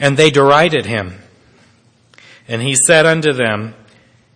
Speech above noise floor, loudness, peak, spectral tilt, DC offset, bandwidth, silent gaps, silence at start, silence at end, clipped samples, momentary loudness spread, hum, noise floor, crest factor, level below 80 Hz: 39 dB; -12 LUFS; 0 dBFS; -3.5 dB/octave; under 0.1%; 11 kHz; none; 0 s; 0.65 s; 0.3%; 15 LU; none; -52 dBFS; 14 dB; -54 dBFS